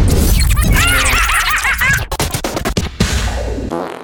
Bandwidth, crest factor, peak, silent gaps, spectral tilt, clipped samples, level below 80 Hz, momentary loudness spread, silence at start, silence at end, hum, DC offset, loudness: 19.5 kHz; 14 dB; 0 dBFS; none; -3.5 dB/octave; under 0.1%; -18 dBFS; 9 LU; 0 s; 0 s; none; under 0.1%; -14 LUFS